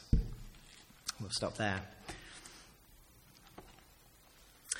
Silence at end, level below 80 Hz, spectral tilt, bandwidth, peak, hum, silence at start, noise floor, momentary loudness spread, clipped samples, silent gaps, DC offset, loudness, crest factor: 0 s; -44 dBFS; -4 dB/octave; 17 kHz; -16 dBFS; none; 0 s; -63 dBFS; 25 LU; under 0.1%; none; under 0.1%; -40 LUFS; 26 dB